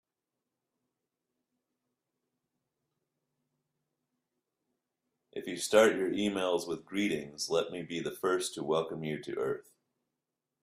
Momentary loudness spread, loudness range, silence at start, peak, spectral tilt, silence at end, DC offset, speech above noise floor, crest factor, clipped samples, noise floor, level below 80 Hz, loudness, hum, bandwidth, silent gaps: 12 LU; 4 LU; 5.35 s; -10 dBFS; -4 dB/octave; 1 s; under 0.1%; 57 dB; 26 dB; under 0.1%; -88 dBFS; -74 dBFS; -32 LUFS; none; 15.5 kHz; none